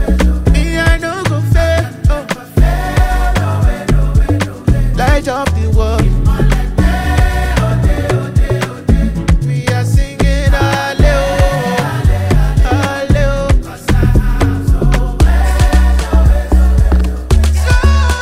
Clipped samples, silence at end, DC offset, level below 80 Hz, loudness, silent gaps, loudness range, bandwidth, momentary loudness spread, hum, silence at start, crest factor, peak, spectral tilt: under 0.1%; 0 s; under 0.1%; -12 dBFS; -13 LUFS; none; 2 LU; 15 kHz; 4 LU; none; 0 s; 10 dB; 0 dBFS; -6.5 dB/octave